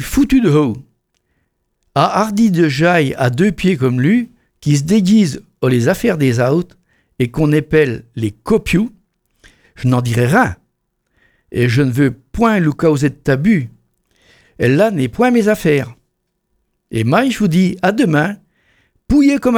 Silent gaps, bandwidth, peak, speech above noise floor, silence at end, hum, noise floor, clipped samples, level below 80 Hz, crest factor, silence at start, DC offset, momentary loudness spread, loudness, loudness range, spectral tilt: none; 17.5 kHz; 0 dBFS; 55 dB; 0 s; none; -69 dBFS; under 0.1%; -38 dBFS; 14 dB; 0 s; under 0.1%; 9 LU; -14 LUFS; 3 LU; -6.5 dB/octave